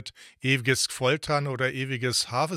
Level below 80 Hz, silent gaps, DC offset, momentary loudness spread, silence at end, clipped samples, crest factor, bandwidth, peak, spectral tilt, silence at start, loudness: -60 dBFS; none; under 0.1%; 6 LU; 0 s; under 0.1%; 18 dB; 16 kHz; -8 dBFS; -3.5 dB/octave; 0 s; -26 LUFS